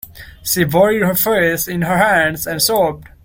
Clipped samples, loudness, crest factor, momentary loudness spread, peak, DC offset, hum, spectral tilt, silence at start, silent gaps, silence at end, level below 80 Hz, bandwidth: under 0.1%; -15 LUFS; 14 dB; 6 LU; -2 dBFS; under 0.1%; none; -4 dB/octave; 0.05 s; none; 0.2 s; -44 dBFS; 17 kHz